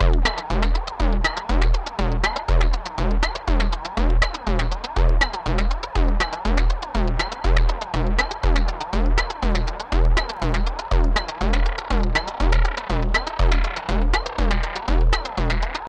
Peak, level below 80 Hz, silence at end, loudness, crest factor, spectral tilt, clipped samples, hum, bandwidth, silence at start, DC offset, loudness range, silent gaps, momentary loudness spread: -4 dBFS; -20 dBFS; 0 s; -23 LUFS; 16 dB; -5.5 dB/octave; under 0.1%; none; 8.4 kHz; 0 s; under 0.1%; 1 LU; none; 3 LU